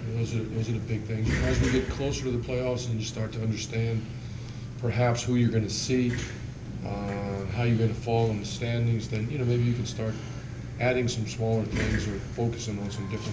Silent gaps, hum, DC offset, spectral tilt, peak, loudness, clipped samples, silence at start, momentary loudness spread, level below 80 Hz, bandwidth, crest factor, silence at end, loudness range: none; none; under 0.1%; -6 dB/octave; -14 dBFS; -29 LUFS; under 0.1%; 0 s; 10 LU; -40 dBFS; 8 kHz; 14 dB; 0 s; 2 LU